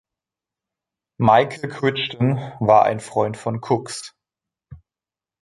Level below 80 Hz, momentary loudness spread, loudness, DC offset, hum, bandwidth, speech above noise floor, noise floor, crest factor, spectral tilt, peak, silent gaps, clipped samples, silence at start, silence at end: -56 dBFS; 12 LU; -20 LUFS; under 0.1%; none; 11.5 kHz; over 71 dB; under -90 dBFS; 20 dB; -6 dB/octave; -2 dBFS; none; under 0.1%; 1.2 s; 0.65 s